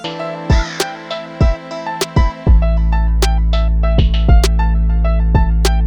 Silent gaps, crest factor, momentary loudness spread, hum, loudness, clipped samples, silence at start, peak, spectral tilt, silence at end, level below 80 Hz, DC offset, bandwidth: none; 12 dB; 10 LU; none; -16 LUFS; under 0.1%; 0 s; 0 dBFS; -6 dB/octave; 0 s; -14 dBFS; under 0.1%; 13 kHz